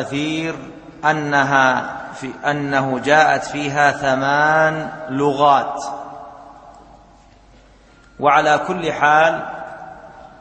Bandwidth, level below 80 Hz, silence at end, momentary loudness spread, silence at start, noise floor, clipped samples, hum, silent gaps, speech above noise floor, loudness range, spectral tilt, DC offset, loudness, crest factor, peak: 8.8 kHz; -54 dBFS; 0.1 s; 18 LU; 0 s; -48 dBFS; under 0.1%; none; none; 31 dB; 6 LU; -4.5 dB/octave; under 0.1%; -17 LUFS; 18 dB; 0 dBFS